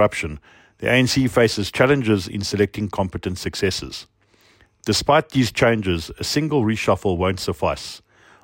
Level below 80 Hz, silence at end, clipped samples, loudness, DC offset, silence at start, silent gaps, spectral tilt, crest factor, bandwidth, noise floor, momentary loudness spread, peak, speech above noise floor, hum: -44 dBFS; 0.45 s; under 0.1%; -20 LUFS; under 0.1%; 0 s; none; -5 dB/octave; 18 dB; 16.5 kHz; -56 dBFS; 12 LU; -4 dBFS; 36 dB; none